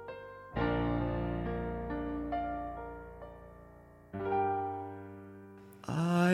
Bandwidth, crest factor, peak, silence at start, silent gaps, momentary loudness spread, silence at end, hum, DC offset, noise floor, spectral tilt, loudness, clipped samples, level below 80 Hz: 13 kHz; 18 dB; -18 dBFS; 0 s; none; 20 LU; 0 s; none; under 0.1%; -56 dBFS; -7.5 dB/octave; -36 LUFS; under 0.1%; -48 dBFS